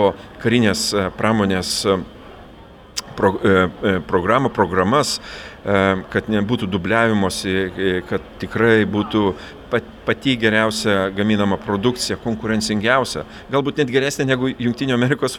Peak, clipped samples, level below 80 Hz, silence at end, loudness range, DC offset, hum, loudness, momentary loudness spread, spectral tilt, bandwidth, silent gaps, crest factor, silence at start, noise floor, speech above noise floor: 0 dBFS; under 0.1%; -46 dBFS; 0 s; 1 LU; under 0.1%; none; -19 LUFS; 8 LU; -5 dB/octave; 17.5 kHz; none; 18 dB; 0 s; -42 dBFS; 23 dB